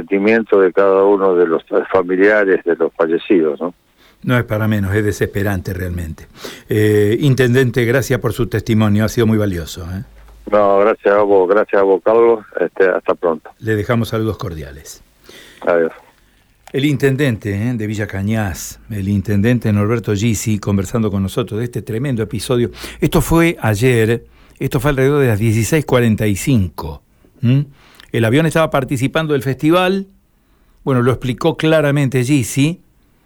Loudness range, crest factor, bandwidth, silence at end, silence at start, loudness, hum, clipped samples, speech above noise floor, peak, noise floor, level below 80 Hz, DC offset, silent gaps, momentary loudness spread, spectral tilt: 5 LU; 12 dB; 19.5 kHz; 0.5 s; 0 s; -15 LUFS; none; under 0.1%; 40 dB; -2 dBFS; -54 dBFS; -38 dBFS; under 0.1%; none; 11 LU; -6.5 dB/octave